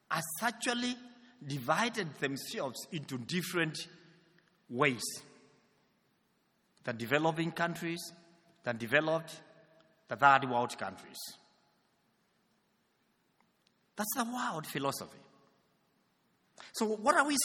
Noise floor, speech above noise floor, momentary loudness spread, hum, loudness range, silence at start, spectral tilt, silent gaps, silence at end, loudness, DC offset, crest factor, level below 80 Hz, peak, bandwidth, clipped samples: -75 dBFS; 42 dB; 17 LU; none; 8 LU; 0.1 s; -3.5 dB/octave; none; 0 s; -34 LUFS; under 0.1%; 26 dB; -80 dBFS; -10 dBFS; 19 kHz; under 0.1%